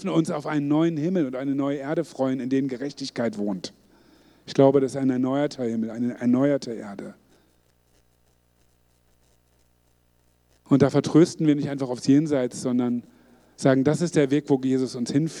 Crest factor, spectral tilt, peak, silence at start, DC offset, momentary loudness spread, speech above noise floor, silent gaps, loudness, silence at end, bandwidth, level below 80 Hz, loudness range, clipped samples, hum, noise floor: 20 dB; -7 dB/octave; -4 dBFS; 0 s; under 0.1%; 11 LU; 41 dB; none; -24 LUFS; 0 s; 11.5 kHz; -68 dBFS; 6 LU; under 0.1%; 60 Hz at -55 dBFS; -64 dBFS